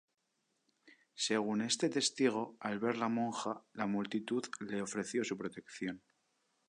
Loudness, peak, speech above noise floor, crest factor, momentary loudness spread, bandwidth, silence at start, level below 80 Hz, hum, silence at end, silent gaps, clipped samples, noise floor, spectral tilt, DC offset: -37 LUFS; -18 dBFS; 46 dB; 20 dB; 10 LU; 11 kHz; 0.85 s; -80 dBFS; none; 0.7 s; none; under 0.1%; -82 dBFS; -3.5 dB/octave; under 0.1%